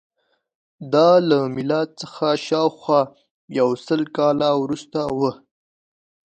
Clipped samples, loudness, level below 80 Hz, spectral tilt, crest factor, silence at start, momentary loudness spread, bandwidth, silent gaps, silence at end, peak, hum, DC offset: under 0.1%; -20 LUFS; -62 dBFS; -6.5 dB/octave; 18 dB; 0.8 s; 10 LU; 9 kHz; 3.31-3.48 s; 0.95 s; -2 dBFS; none; under 0.1%